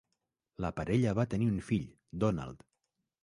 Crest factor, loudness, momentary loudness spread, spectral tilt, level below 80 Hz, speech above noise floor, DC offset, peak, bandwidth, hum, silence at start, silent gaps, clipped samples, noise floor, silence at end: 18 dB; -33 LUFS; 9 LU; -8 dB/octave; -54 dBFS; 53 dB; under 0.1%; -16 dBFS; 11.5 kHz; none; 0.6 s; none; under 0.1%; -85 dBFS; 0.7 s